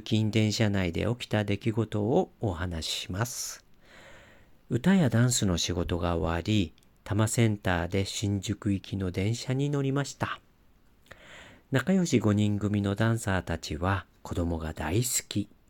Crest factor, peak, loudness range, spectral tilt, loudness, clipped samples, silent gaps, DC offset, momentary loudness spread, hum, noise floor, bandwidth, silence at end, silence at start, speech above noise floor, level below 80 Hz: 18 dB; -12 dBFS; 4 LU; -5 dB/octave; -29 LUFS; under 0.1%; none; under 0.1%; 9 LU; none; -60 dBFS; 17 kHz; 0.25 s; 0 s; 33 dB; -48 dBFS